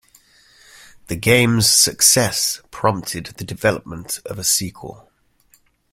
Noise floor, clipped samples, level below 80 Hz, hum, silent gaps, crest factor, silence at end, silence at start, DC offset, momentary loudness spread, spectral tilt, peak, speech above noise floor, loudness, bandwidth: -58 dBFS; under 0.1%; -48 dBFS; none; none; 20 dB; 1 s; 1.1 s; under 0.1%; 18 LU; -2.5 dB/octave; 0 dBFS; 39 dB; -16 LUFS; 16.5 kHz